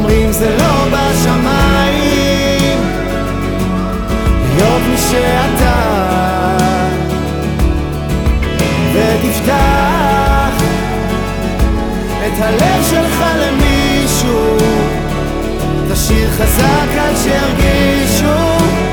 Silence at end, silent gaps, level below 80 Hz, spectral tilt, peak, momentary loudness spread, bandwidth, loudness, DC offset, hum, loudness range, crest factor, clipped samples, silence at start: 0 s; none; -20 dBFS; -5 dB/octave; 0 dBFS; 6 LU; over 20 kHz; -13 LUFS; under 0.1%; none; 2 LU; 12 dB; under 0.1%; 0 s